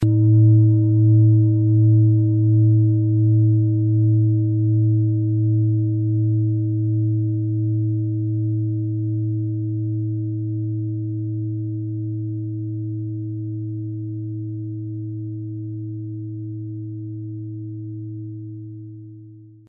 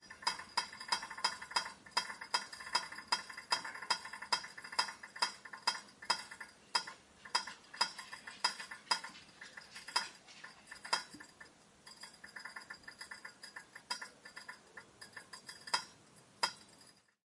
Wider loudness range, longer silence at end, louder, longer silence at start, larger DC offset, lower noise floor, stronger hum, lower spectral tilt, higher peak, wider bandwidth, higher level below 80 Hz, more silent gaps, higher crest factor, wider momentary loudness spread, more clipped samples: first, 14 LU vs 11 LU; second, 0.2 s vs 0.4 s; first, -20 LUFS vs -39 LUFS; about the same, 0 s vs 0 s; neither; second, -43 dBFS vs -64 dBFS; neither; first, -18 dB/octave vs 0.5 dB/octave; first, -6 dBFS vs -18 dBFS; second, 0.7 kHz vs 11.5 kHz; first, -58 dBFS vs -82 dBFS; neither; second, 12 dB vs 26 dB; about the same, 16 LU vs 15 LU; neither